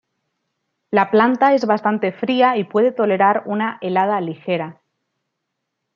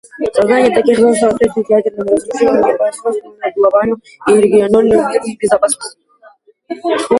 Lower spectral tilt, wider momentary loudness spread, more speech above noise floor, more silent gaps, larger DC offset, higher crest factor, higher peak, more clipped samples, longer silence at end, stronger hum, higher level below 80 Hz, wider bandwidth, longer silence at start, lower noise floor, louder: first, -7 dB/octave vs -4.5 dB/octave; about the same, 9 LU vs 10 LU; first, 60 dB vs 33 dB; neither; neither; first, 18 dB vs 12 dB; about the same, -2 dBFS vs 0 dBFS; neither; first, 1.25 s vs 0 s; neither; second, -70 dBFS vs -48 dBFS; second, 7 kHz vs 11.5 kHz; first, 0.9 s vs 0.15 s; first, -77 dBFS vs -45 dBFS; second, -18 LUFS vs -13 LUFS